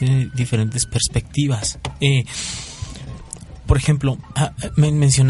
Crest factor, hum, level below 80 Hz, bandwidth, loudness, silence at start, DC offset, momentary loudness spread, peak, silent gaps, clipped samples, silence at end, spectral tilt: 16 dB; none; -32 dBFS; 11.5 kHz; -20 LUFS; 0 s; under 0.1%; 15 LU; -2 dBFS; none; under 0.1%; 0 s; -5 dB/octave